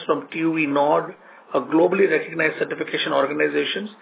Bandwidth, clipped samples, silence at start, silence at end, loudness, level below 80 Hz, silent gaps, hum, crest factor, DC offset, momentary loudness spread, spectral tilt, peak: 4 kHz; under 0.1%; 0 s; 0.1 s; -21 LUFS; -78 dBFS; none; none; 16 dB; under 0.1%; 8 LU; -9 dB/octave; -6 dBFS